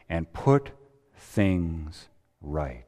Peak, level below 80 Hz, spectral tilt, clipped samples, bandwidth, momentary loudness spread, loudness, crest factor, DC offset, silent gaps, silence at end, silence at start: -8 dBFS; -42 dBFS; -8 dB/octave; under 0.1%; 13 kHz; 22 LU; -27 LUFS; 20 dB; under 0.1%; none; 0.05 s; 0.1 s